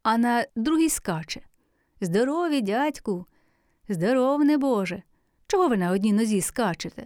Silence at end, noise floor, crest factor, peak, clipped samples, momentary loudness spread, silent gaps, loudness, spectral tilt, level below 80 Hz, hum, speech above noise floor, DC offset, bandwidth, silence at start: 0 s; -66 dBFS; 14 dB; -10 dBFS; under 0.1%; 11 LU; none; -24 LUFS; -5 dB/octave; -56 dBFS; none; 42 dB; under 0.1%; over 20 kHz; 0.05 s